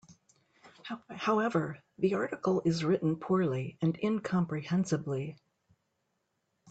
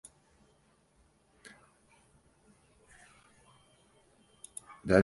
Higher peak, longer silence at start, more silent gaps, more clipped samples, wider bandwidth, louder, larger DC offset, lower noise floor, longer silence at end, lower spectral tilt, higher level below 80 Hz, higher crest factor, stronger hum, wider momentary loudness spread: second, -16 dBFS vs -10 dBFS; second, 0.1 s vs 4.85 s; neither; neither; second, 8.2 kHz vs 11.5 kHz; first, -31 LUFS vs -36 LUFS; neither; first, -80 dBFS vs -68 dBFS; about the same, 0 s vs 0 s; about the same, -7 dB/octave vs -6.5 dB/octave; second, -70 dBFS vs -60 dBFS; second, 16 dB vs 30 dB; neither; second, 11 LU vs 18 LU